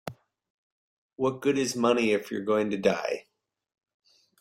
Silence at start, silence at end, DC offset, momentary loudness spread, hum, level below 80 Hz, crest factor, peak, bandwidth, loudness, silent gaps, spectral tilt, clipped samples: 0.05 s; 1.2 s; under 0.1%; 8 LU; none; -68 dBFS; 20 dB; -10 dBFS; 16.5 kHz; -27 LUFS; 0.50-1.09 s; -4.5 dB/octave; under 0.1%